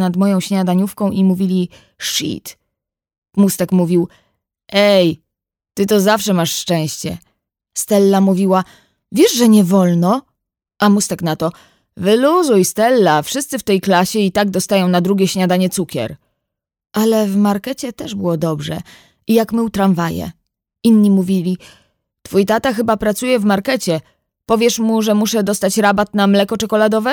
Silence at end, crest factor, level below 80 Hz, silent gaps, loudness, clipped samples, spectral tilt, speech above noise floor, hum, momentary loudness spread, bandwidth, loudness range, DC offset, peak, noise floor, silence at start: 0 s; 14 dB; -52 dBFS; 3.18-3.22 s; -15 LUFS; under 0.1%; -5 dB/octave; 67 dB; none; 12 LU; 18.5 kHz; 4 LU; under 0.1%; 0 dBFS; -82 dBFS; 0 s